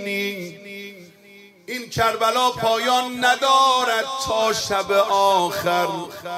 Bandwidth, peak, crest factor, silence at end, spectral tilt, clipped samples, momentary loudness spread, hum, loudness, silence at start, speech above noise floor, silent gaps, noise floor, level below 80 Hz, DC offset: 16 kHz; -4 dBFS; 18 dB; 0 s; -2.5 dB/octave; under 0.1%; 16 LU; none; -19 LUFS; 0 s; 28 dB; none; -48 dBFS; -54 dBFS; under 0.1%